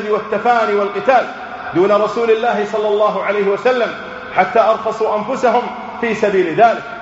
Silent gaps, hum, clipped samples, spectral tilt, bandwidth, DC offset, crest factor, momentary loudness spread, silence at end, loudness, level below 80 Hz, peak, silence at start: none; none; under 0.1%; -3 dB/octave; 8 kHz; under 0.1%; 16 dB; 7 LU; 0 s; -15 LUFS; -56 dBFS; 0 dBFS; 0 s